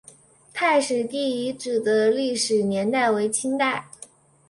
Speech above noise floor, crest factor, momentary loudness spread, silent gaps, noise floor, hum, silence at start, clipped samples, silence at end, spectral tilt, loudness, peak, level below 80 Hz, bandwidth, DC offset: 29 dB; 16 dB; 8 LU; none; -51 dBFS; none; 0.55 s; under 0.1%; 0.45 s; -3.5 dB/octave; -23 LUFS; -8 dBFS; -68 dBFS; 11.5 kHz; under 0.1%